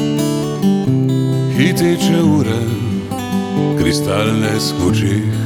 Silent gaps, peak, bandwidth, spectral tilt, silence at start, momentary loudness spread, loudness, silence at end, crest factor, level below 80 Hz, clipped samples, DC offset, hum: none; -2 dBFS; 19 kHz; -6 dB/octave; 0 s; 6 LU; -15 LUFS; 0 s; 14 dB; -42 dBFS; under 0.1%; under 0.1%; none